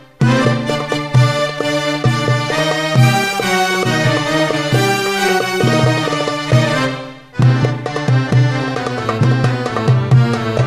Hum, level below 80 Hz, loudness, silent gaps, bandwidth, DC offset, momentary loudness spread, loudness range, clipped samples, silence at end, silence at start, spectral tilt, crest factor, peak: none; -42 dBFS; -15 LUFS; none; 15 kHz; 0.2%; 5 LU; 1 LU; under 0.1%; 0 s; 0.2 s; -5.5 dB/octave; 14 dB; 0 dBFS